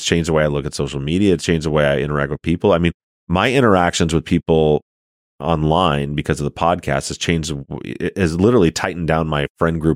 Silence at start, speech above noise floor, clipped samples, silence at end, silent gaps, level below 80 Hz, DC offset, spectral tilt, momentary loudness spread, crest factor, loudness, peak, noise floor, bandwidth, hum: 0 s; over 73 dB; under 0.1%; 0 s; 2.94-3.27 s, 4.82-5.38 s, 9.50-9.55 s; -36 dBFS; under 0.1%; -5.5 dB/octave; 8 LU; 16 dB; -18 LUFS; -2 dBFS; under -90 dBFS; 14.5 kHz; none